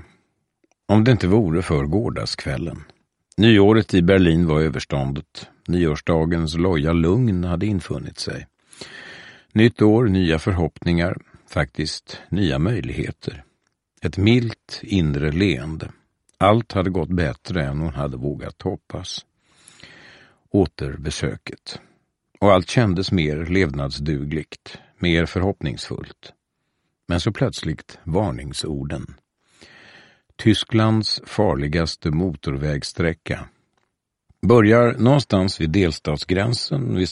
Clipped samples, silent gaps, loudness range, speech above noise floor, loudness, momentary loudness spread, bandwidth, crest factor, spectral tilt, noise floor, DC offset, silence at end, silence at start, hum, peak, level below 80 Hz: under 0.1%; none; 8 LU; 54 dB; -20 LUFS; 16 LU; 11.5 kHz; 20 dB; -6.5 dB/octave; -74 dBFS; under 0.1%; 0 s; 0.9 s; none; -2 dBFS; -38 dBFS